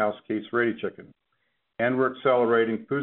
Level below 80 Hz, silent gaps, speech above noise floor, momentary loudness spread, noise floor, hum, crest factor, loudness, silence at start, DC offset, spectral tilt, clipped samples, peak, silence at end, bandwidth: -72 dBFS; none; 50 dB; 11 LU; -75 dBFS; none; 16 dB; -25 LUFS; 0 s; under 0.1%; -4.5 dB/octave; under 0.1%; -8 dBFS; 0 s; 4.2 kHz